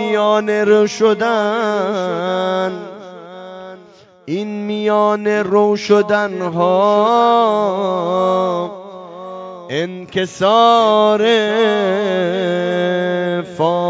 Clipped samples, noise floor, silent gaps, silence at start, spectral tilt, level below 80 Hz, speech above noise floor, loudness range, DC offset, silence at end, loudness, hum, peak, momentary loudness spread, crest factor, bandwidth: under 0.1%; -44 dBFS; none; 0 s; -5.5 dB/octave; -64 dBFS; 29 dB; 6 LU; under 0.1%; 0 s; -15 LUFS; none; 0 dBFS; 19 LU; 16 dB; 7.8 kHz